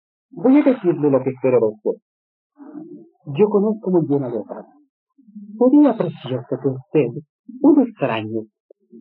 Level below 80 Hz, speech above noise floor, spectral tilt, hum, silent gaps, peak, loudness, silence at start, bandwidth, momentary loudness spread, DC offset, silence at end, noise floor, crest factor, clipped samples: -72 dBFS; 21 dB; -7.5 dB/octave; none; 2.02-2.50 s, 4.89-5.07 s, 7.29-7.44 s, 8.60-8.69 s; -4 dBFS; -18 LUFS; 0.35 s; 4.1 kHz; 21 LU; under 0.1%; 0 s; -38 dBFS; 16 dB; under 0.1%